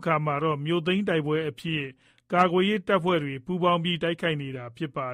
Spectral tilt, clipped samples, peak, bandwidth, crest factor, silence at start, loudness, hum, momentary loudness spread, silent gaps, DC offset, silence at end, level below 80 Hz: -7 dB/octave; under 0.1%; -8 dBFS; 11.5 kHz; 20 dB; 0 s; -26 LUFS; none; 9 LU; none; under 0.1%; 0 s; -62 dBFS